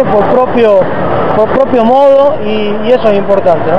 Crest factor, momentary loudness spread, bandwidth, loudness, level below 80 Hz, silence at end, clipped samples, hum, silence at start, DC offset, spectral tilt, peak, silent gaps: 8 dB; 6 LU; 6.4 kHz; -8 LUFS; -38 dBFS; 0 s; 2%; none; 0 s; 10%; -8 dB/octave; 0 dBFS; none